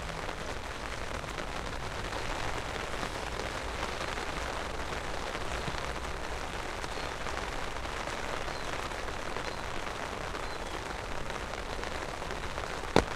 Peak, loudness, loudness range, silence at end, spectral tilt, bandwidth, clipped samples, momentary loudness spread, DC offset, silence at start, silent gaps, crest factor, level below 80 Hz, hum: -4 dBFS; -36 LUFS; 2 LU; 0 s; -4 dB/octave; 15.5 kHz; under 0.1%; 3 LU; under 0.1%; 0 s; none; 32 dB; -44 dBFS; none